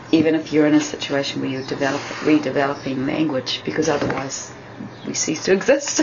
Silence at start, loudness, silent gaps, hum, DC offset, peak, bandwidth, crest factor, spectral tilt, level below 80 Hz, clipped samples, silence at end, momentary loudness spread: 0 s; -20 LUFS; none; none; under 0.1%; -2 dBFS; 7.6 kHz; 18 dB; -4 dB/octave; -56 dBFS; under 0.1%; 0 s; 10 LU